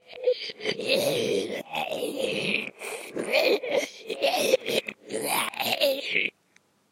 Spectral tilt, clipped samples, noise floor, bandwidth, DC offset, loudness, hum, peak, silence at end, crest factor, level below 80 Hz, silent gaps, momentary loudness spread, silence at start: -2.5 dB/octave; under 0.1%; -64 dBFS; 16 kHz; under 0.1%; -27 LUFS; none; -8 dBFS; 0.6 s; 20 dB; -78 dBFS; none; 8 LU; 0.1 s